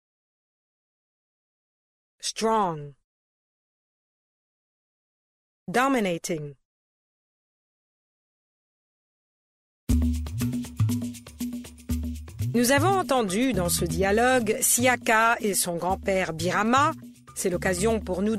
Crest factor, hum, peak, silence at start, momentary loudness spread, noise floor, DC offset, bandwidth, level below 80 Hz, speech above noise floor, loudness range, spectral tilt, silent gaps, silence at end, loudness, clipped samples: 20 dB; none; -8 dBFS; 2.2 s; 14 LU; under -90 dBFS; under 0.1%; 16 kHz; -40 dBFS; over 66 dB; 11 LU; -4 dB/octave; 3.04-5.66 s, 6.65-9.87 s; 0 s; -24 LUFS; under 0.1%